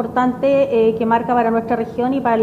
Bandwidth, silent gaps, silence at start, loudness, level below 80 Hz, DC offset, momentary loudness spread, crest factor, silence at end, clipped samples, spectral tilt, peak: 7.8 kHz; none; 0 s; -17 LUFS; -50 dBFS; under 0.1%; 4 LU; 14 dB; 0 s; under 0.1%; -8 dB/octave; -2 dBFS